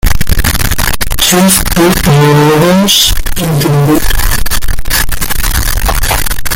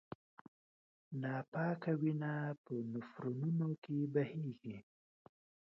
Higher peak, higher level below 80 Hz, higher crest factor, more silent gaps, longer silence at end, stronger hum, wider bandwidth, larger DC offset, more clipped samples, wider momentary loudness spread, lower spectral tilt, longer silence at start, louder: first, 0 dBFS vs -22 dBFS; first, -14 dBFS vs -82 dBFS; second, 8 dB vs 18 dB; second, none vs 1.48-1.52 s, 2.58-2.64 s, 3.78-3.82 s; second, 0 s vs 0.8 s; neither; first, 17.5 kHz vs 5.8 kHz; neither; first, 0.2% vs under 0.1%; second, 7 LU vs 13 LU; second, -4 dB/octave vs -8.5 dB/octave; second, 0.05 s vs 1.1 s; first, -9 LUFS vs -41 LUFS